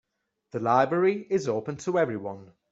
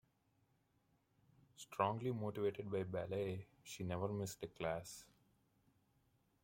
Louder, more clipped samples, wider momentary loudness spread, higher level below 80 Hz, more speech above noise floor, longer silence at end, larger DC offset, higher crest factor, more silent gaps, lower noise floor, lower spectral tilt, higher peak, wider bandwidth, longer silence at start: first, -26 LUFS vs -43 LUFS; neither; first, 15 LU vs 12 LU; first, -70 dBFS vs -76 dBFS; first, 47 dB vs 36 dB; second, 0.25 s vs 1.4 s; neither; about the same, 20 dB vs 24 dB; neither; second, -73 dBFS vs -79 dBFS; about the same, -6.5 dB/octave vs -6 dB/octave; first, -8 dBFS vs -22 dBFS; second, 8 kHz vs 16.5 kHz; second, 0.55 s vs 1.6 s